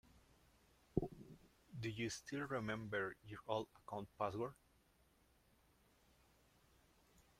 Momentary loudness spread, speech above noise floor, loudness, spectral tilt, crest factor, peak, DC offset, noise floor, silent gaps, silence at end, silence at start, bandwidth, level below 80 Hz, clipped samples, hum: 11 LU; 29 dB; -46 LUFS; -5.5 dB/octave; 28 dB; -22 dBFS; under 0.1%; -75 dBFS; none; 0.2 s; 0.15 s; 16 kHz; -68 dBFS; under 0.1%; none